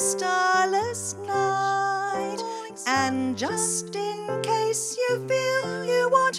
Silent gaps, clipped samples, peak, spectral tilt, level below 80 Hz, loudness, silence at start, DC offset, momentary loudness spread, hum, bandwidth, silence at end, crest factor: none; under 0.1%; -8 dBFS; -3 dB/octave; -70 dBFS; -25 LUFS; 0 s; under 0.1%; 9 LU; none; 15.5 kHz; 0 s; 16 dB